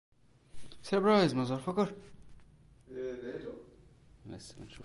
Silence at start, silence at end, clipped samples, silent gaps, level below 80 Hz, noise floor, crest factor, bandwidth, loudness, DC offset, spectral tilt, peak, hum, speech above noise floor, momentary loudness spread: 0.55 s; 0 s; under 0.1%; none; -62 dBFS; -59 dBFS; 20 dB; 11.5 kHz; -32 LUFS; under 0.1%; -6.5 dB/octave; -14 dBFS; none; 27 dB; 23 LU